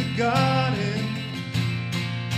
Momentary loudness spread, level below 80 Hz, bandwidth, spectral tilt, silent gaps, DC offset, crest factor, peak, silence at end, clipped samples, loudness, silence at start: 8 LU; -58 dBFS; 15.5 kHz; -6 dB/octave; none; under 0.1%; 16 dB; -8 dBFS; 0 s; under 0.1%; -25 LUFS; 0 s